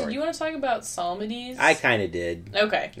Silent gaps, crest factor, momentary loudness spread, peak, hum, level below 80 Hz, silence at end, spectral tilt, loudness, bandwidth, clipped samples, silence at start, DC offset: none; 20 dB; 10 LU; -6 dBFS; none; -56 dBFS; 0 s; -3.5 dB/octave; -25 LUFS; 15.5 kHz; under 0.1%; 0 s; under 0.1%